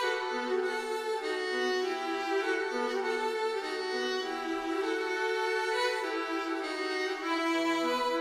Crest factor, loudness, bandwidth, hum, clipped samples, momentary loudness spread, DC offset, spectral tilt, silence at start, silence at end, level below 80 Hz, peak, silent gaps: 14 dB; -31 LUFS; 15 kHz; none; under 0.1%; 4 LU; under 0.1%; -1.5 dB/octave; 0 s; 0 s; -72 dBFS; -18 dBFS; none